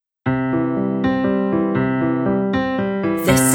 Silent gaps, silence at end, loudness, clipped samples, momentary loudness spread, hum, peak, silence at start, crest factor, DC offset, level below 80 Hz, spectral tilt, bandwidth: none; 0 s; -19 LUFS; under 0.1%; 3 LU; none; -2 dBFS; 0.25 s; 16 dB; under 0.1%; -44 dBFS; -5.5 dB/octave; 19.5 kHz